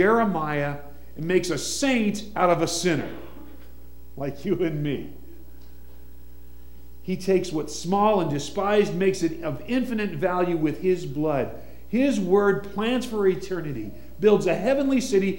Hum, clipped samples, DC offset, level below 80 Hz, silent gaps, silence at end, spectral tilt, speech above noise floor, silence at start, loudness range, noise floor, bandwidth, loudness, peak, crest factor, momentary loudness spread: none; under 0.1%; 1%; -48 dBFS; none; 0 s; -5.5 dB/octave; 23 dB; 0 s; 8 LU; -47 dBFS; 16.5 kHz; -24 LUFS; -6 dBFS; 18 dB; 13 LU